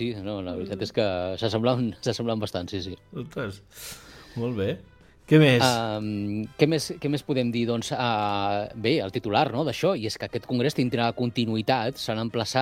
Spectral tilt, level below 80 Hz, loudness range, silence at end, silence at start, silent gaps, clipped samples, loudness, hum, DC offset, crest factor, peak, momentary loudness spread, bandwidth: -5.5 dB/octave; -58 dBFS; 6 LU; 0 s; 0 s; none; under 0.1%; -26 LUFS; none; under 0.1%; 22 dB; -4 dBFS; 11 LU; 16.5 kHz